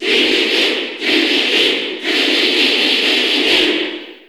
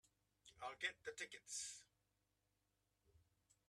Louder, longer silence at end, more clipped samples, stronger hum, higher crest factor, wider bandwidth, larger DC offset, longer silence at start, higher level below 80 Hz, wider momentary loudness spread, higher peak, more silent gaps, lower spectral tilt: first, -13 LUFS vs -50 LUFS; second, 0.1 s vs 0.5 s; neither; neither; second, 14 dB vs 26 dB; first, over 20 kHz vs 13 kHz; neither; second, 0 s vs 0.45 s; first, -60 dBFS vs -86 dBFS; second, 5 LU vs 11 LU; first, -2 dBFS vs -30 dBFS; neither; first, -1 dB/octave vs 0.5 dB/octave